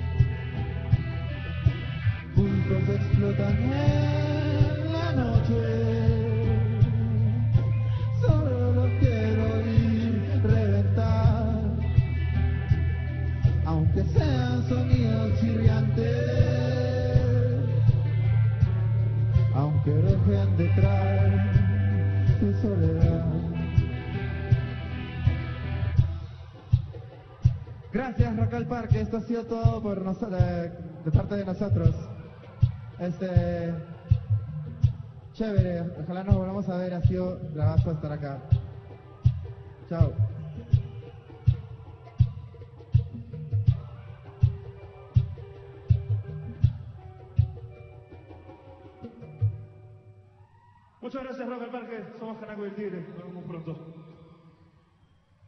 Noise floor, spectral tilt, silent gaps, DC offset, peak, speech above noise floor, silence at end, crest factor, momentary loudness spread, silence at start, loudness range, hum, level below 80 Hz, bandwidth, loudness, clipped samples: -62 dBFS; -9.5 dB/octave; none; under 0.1%; -6 dBFS; 36 dB; 1.35 s; 20 dB; 16 LU; 0 s; 11 LU; none; -38 dBFS; 6.2 kHz; -26 LUFS; under 0.1%